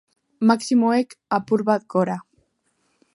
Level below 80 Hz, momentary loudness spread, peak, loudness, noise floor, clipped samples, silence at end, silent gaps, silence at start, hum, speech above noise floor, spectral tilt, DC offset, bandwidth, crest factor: -72 dBFS; 7 LU; -4 dBFS; -21 LUFS; -69 dBFS; under 0.1%; 0.95 s; none; 0.4 s; none; 49 dB; -6 dB/octave; under 0.1%; 11.5 kHz; 18 dB